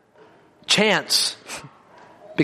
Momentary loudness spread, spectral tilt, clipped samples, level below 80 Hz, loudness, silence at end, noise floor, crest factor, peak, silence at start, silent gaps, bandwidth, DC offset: 19 LU; -2.5 dB/octave; under 0.1%; -68 dBFS; -19 LUFS; 0 s; -52 dBFS; 22 dB; -4 dBFS; 0.7 s; none; 15.5 kHz; under 0.1%